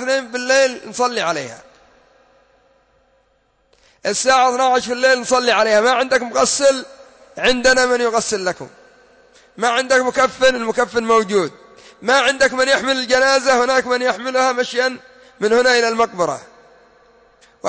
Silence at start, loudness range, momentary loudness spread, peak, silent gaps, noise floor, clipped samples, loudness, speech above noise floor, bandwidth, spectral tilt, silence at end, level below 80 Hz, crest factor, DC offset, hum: 0 s; 6 LU; 9 LU; -4 dBFS; none; -61 dBFS; under 0.1%; -16 LUFS; 45 dB; 8 kHz; -2 dB/octave; 0 s; -54 dBFS; 14 dB; under 0.1%; none